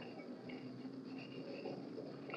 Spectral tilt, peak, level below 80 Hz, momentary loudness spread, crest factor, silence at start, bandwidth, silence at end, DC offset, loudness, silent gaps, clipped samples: -7 dB/octave; -34 dBFS; -88 dBFS; 3 LU; 16 dB; 0 s; 9.2 kHz; 0 s; under 0.1%; -49 LUFS; none; under 0.1%